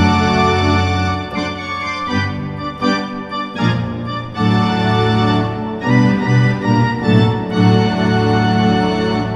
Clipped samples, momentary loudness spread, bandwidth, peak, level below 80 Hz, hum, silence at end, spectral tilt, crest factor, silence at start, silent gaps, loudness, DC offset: under 0.1%; 8 LU; 9.4 kHz; 0 dBFS; -42 dBFS; none; 0 s; -7 dB/octave; 14 dB; 0 s; none; -16 LUFS; under 0.1%